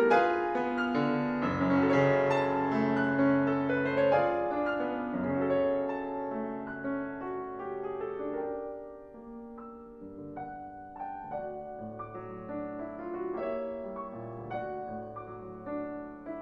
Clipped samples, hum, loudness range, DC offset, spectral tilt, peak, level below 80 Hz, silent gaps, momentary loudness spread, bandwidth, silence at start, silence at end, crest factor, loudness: under 0.1%; none; 14 LU; under 0.1%; -8 dB/octave; -12 dBFS; -62 dBFS; none; 17 LU; 7.4 kHz; 0 s; 0 s; 20 dB; -31 LUFS